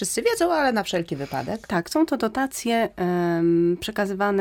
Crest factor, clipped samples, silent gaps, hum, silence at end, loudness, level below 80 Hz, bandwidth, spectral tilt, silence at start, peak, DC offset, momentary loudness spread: 14 dB; under 0.1%; none; none; 0 s; -23 LUFS; -54 dBFS; 17 kHz; -5 dB/octave; 0 s; -10 dBFS; under 0.1%; 7 LU